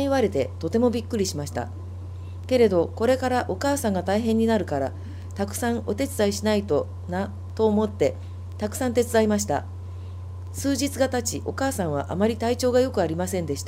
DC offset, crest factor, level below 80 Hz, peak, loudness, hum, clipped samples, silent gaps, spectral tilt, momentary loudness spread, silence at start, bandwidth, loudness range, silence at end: under 0.1%; 16 dB; -48 dBFS; -8 dBFS; -24 LUFS; none; under 0.1%; none; -5.5 dB/octave; 15 LU; 0 s; 16 kHz; 2 LU; 0 s